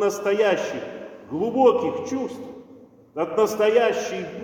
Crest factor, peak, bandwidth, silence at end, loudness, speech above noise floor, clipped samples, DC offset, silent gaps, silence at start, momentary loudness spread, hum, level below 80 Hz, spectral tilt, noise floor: 18 dB; -4 dBFS; 17 kHz; 0 s; -22 LUFS; 27 dB; under 0.1%; under 0.1%; none; 0 s; 18 LU; none; -66 dBFS; -4.5 dB/octave; -48 dBFS